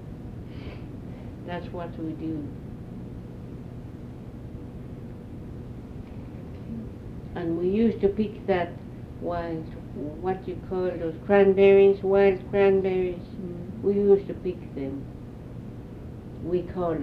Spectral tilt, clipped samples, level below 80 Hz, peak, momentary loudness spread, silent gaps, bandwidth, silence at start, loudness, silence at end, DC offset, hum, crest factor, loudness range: -9 dB/octave; under 0.1%; -46 dBFS; -6 dBFS; 19 LU; none; 5 kHz; 0 s; -25 LUFS; 0 s; under 0.1%; none; 20 dB; 18 LU